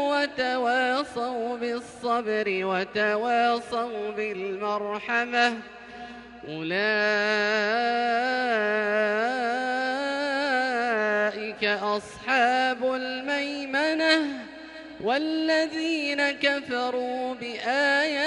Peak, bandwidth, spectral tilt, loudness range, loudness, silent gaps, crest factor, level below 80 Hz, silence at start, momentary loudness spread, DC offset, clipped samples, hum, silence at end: -8 dBFS; 11.5 kHz; -3.5 dB/octave; 2 LU; -25 LUFS; none; 18 dB; -66 dBFS; 0 s; 9 LU; under 0.1%; under 0.1%; none; 0 s